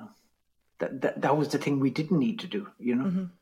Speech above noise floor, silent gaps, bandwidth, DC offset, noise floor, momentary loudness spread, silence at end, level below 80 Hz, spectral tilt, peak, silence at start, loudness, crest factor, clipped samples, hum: 44 dB; none; 15 kHz; under 0.1%; -72 dBFS; 9 LU; 0.1 s; -74 dBFS; -7 dB/octave; -12 dBFS; 0 s; -29 LUFS; 16 dB; under 0.1%; none